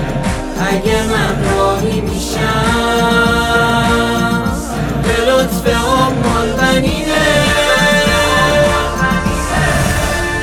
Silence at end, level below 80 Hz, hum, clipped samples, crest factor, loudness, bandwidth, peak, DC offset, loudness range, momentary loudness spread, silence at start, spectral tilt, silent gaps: 0 s; -24 dBFS; none; under 0.1%; 12 dB; -13 LUFS; 19.5 kHz; 0 dBFS; under 0.1%; 2 LU; 6 LU; 0 s; -4.5 dB/octave; none